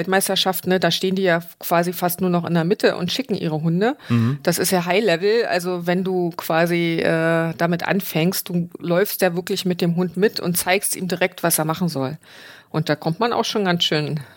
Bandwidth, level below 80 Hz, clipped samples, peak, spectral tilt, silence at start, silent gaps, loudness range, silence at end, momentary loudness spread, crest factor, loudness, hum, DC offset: 17 kHz; -64 dBFS; under 0.1%; -4 dBFS; -4.5 dB/octave; 0 s; none; 2 LU; 0.1 s; 5 LU; 16 dB; -20 LUFS; none; under 0.1%